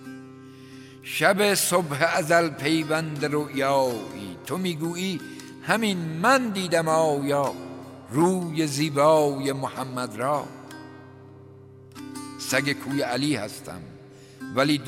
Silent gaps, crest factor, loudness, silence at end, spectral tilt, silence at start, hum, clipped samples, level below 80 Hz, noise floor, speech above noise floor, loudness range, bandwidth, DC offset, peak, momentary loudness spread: none; 22 dB; -24 LUFS; 0 s; -4.5 dB/octave; 0 s; none; under 0.1%; -68 dBFS; -47 dBFS; 23 dB; 7 LU; 16 kHz; under 0.1%; -4 dBFS; 21 LU